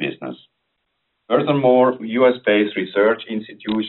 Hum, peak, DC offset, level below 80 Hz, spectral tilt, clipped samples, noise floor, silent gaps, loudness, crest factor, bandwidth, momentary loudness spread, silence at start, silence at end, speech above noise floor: none; -4 dBFS; under 0.1%; -64 dBFS; -4 dB/octave; under 0.1%; -73 dBFS; none; -18 LUFS; 16 dB; 4.2 kHz; 13 LU; 0 s; 0 s; 55 dB